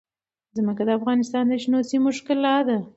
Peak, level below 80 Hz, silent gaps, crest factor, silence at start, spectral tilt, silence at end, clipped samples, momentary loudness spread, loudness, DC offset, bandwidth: -8 dBFS; -70 dBFS; none; 14 dB; 0.55 s; -5.5 dB/octave; 0.05 s; under 0.1%; 5 LU; -22 LUFS; under 0.1%; 8 kHz